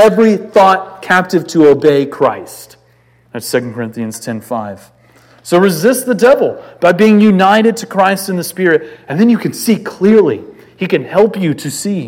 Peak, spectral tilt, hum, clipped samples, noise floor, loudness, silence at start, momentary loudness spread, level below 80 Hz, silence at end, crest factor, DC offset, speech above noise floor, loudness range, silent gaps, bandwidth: 0 dBFS; -5.5 dB/octave; none; 0.5%; -50 dBFS; -12 LUFS; 0 s; 14 LU; -56 dBFS; 0 s; 12 dB; under 0.1%; 38 dB; 7 LU; none; 17 kHz